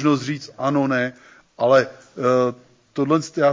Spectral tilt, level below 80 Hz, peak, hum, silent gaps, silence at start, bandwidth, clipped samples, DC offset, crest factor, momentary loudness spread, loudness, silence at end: -6 dB/octave; -66 dBFS; -6 dBFS; none; none; 0 s; 7.6 kHz; under 0.1%; under 0.1%; 14 dB; 11 LU; -21 LUFS; 0 s